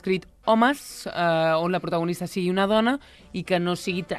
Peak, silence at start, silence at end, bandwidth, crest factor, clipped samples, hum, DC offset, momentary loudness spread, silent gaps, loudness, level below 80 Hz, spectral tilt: -6 dBFS; 0.05 s; 0 s; 14.5 kHz; 18 dB; under 0.1%; none; under 0.1%; 11 LU; none; -24 LUFS; -56 dBFS; -5.5 dB/octave